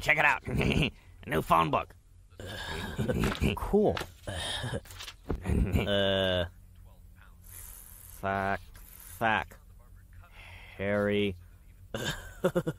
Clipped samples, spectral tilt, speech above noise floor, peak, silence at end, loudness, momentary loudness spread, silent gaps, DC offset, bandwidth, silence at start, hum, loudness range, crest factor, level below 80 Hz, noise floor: under 0.1%; -5.5 dB/octave; 24 dB; -10 dBFS; 0 s; -30 LUFS; 21 LU; none; under 0.1%; 16 kHz; 0 s; none; 5 LU; 22 dB; -42 dBFS; -53 dBFS